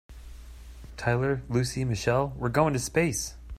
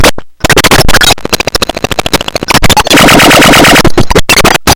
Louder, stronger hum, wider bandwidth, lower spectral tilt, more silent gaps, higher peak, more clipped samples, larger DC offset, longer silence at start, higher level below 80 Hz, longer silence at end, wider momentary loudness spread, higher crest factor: second, -27 LUFS vs -4 LUFS; neither; second, 15.5 kHz vs over 20 kHz; first, -5.5 dB/octave vs -3 dB/octave; neither; second, -8 dBFS vs 0 dBFS; second, under 0.1% vs 10%; neither; about the same, 0.1 s vs 0 s; second, -44 dBFS vs -16 dBFS; about the same, 0 s vs 0 s; first, 22 LU vs 10 LU; first, 20 dB vs 4 dB